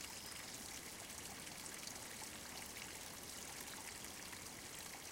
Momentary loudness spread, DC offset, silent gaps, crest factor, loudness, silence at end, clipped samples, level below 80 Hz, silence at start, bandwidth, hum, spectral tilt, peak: 1 LU; under 0.1%; none; 20 dB; -49 LUFS; 0 s; under 0.1%; -70 dBFS; 0 s; 17 kHz; none; -1.5 dB/octave; -32 dBFS